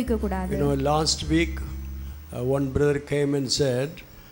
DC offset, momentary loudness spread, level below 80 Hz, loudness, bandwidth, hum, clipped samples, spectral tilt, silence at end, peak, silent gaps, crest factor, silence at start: under 0.1%; 14 LU; -36 dBFS; -24 LUFS; 16.5 kHz; none; under 0.1%; -5 dB/octave; 0 s; -8 dBFS; none; 16 dB; 0 s